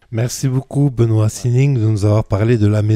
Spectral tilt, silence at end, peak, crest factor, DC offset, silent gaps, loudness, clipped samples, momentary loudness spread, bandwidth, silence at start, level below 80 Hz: -7.5 dB/octave; 0 s; -2 dBFS; 12 dB; under 0.1%; none; -16 LUFS; under 0.1%; 4 LU; 14 kHz; 0.1 s; -40 dBFS